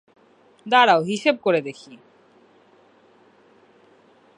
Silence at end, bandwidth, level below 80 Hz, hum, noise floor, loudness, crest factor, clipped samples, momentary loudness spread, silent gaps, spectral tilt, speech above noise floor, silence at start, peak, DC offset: 2.4 s; 11 kHz; -78 dBFS; none; -56 dBFS; -19 LUFS; 22 dB; under 0.1%; 24 LU; none; -4.5 dB/octave; 36 dB; 0.65 s; -2 dBFS; under 0.1%